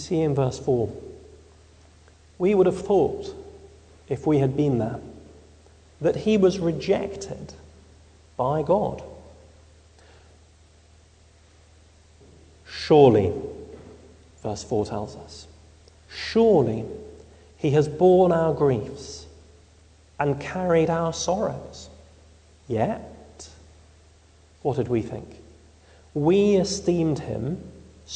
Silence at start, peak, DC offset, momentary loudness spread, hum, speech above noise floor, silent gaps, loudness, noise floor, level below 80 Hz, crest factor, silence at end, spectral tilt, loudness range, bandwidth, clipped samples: 0 s; -2 dBFS; under 0.1%; 24 LU; none; 32 dB; none; -23 LUFS; -54 dBFS; -50 dBFS; 24 dB; 0 s; -6.5 dB/octave; 8 LU; 9.4 kHz; under 0.1%